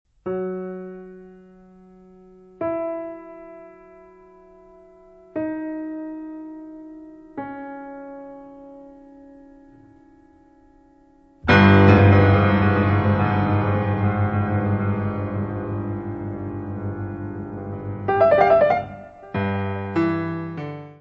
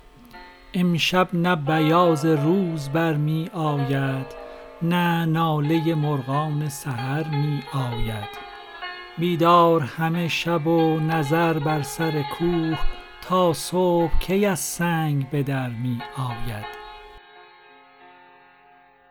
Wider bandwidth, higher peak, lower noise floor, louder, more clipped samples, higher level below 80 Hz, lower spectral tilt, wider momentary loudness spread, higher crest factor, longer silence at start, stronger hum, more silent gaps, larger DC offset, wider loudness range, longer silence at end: second, 5.8 kHz vs 19 kHz; about the same, -2 dBFS vs -4 dBFS; about the same, -54 dBFS vs -54 dBFS; about the same, -21 LUFS vs -22 LUFS; neither; second, -48 dBFS vs -38 dBFS; first, -9.5 dB/octave vs -6 dB/octave; first, 24 LU vs 14 LU; about the same, 22 dB vs 18 dB; about the same, 0.25 s vs 0.35 s; neither; neither; neither; first, 20 LU vs 6 LU; second, 0.1 s vs 1.7 s